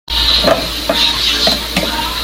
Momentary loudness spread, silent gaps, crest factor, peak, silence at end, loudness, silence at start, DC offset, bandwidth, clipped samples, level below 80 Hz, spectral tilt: 5 LU; none; 14 dB; 0 dBFS; 0 s; -12 LUFS; 0.1 s; under 0.1%; 17 kHz; under 0.1%; -28 dBFS; -2.5 dB/octave